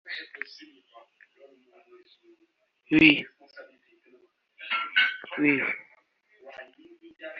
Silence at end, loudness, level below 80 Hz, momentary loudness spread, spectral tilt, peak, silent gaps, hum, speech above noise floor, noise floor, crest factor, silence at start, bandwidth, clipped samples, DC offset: 0 s; -24 LUFS; -64 dBFS; 27 LU; -2 dB/octave; -2 dBFS; none; none; 36 dB; -64 dBFS; 28 dB; 0.05 s; 6.2 kHz; under 0.1%; under 0.1%